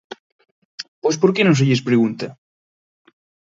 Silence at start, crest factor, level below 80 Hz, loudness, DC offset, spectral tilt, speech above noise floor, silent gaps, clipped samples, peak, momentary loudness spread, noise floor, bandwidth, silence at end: 0.8 s; 20 dB; -64 dBFS; -17 LUFS; under 0.1%; -6 dB/octave; over 74 dB; 0.88-1.02 s; under 0.1%; -2 dBFS; 20 LU; under -90 dBFS; 7.8 kHz; 1.2 s